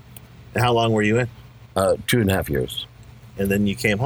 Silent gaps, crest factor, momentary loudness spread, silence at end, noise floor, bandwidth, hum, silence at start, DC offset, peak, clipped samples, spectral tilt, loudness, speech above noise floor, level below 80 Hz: none; 18 dB; 11 LU; 0 s; -43 dBFS; over 20 kHz; none; 0.1 s; under 0.1%; -4 dBFS; under 0.1%; -5.5 dB/octave; -21 LUFS; 23 dB; -44 dBFS